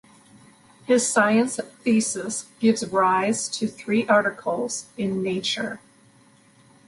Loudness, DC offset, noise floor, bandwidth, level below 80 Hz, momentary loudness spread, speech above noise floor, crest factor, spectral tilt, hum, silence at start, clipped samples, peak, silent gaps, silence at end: -23 LUFS; under 0.1%; -56 dBFS; 11.5 kHz; -66 dBFS; 9 LU; 33 dB; 18 dB; -3.5 dB/octave; none; 0.9 s; under 0.1%; -6 dBFS; none; 1.1 s